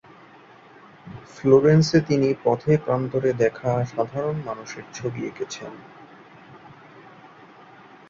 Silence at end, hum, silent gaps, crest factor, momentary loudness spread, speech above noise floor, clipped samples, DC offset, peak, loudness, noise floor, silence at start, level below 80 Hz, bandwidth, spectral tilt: 1.5 s; none; none; 20 dB; 19 LU; 27 dB; under 0.1%; under 0.1%; -4 dBFS; -22 LUFS; -49 dBFS; 1.05 s; -58 dBFS; 7.6 kHz; -7 dB/octave